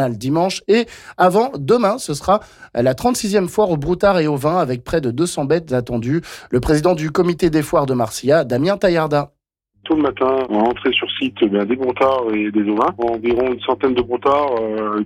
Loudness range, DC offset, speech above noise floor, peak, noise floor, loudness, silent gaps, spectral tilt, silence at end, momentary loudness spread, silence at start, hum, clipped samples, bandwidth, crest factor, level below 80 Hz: 1 LU; under 0.1%; 45 dB; -4 dBFS; -62 dBFS; -17 LUFS; none; -5.5 dB/octave; 0 s; 5 LU; 0 s; none; under 0.1%; 16.5 kHz; 12 dB; -42 dBFS